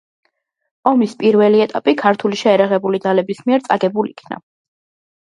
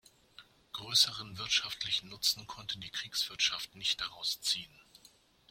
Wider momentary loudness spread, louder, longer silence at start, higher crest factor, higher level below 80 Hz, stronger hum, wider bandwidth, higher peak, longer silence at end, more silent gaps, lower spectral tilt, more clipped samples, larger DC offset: second, 10 LU vs 13 LU; first, -15 LUFS vs -32 LUFS; first, 0.85 s vs 0.4 s; second, 16 dB vs 24 dB; about the same, -66 dBFS vs -68 dBFS; neither; second, 10.5 kHz vs 16.5 kHz; first, 0 dBFS vs -12 dBFS; first, 0.8 s vs 0.55 s; neither; first, -6.5 dB/octave vs 0.5 dB/octave; neither; neither